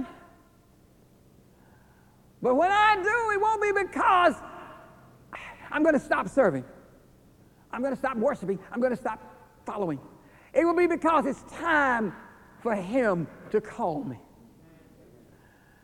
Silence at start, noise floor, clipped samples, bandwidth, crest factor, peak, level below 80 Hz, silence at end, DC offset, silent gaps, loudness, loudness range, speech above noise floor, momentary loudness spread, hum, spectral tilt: 0 s; -58 dBFS; under 0.1%; 16.5 kHz; 20 dB; -8 dBFS; -60 dBFS; 1.65 s; under 0.1%; none; -26 LUFS; 7 LU; 33 dB; 20 LU; none; -5.5 dB/octave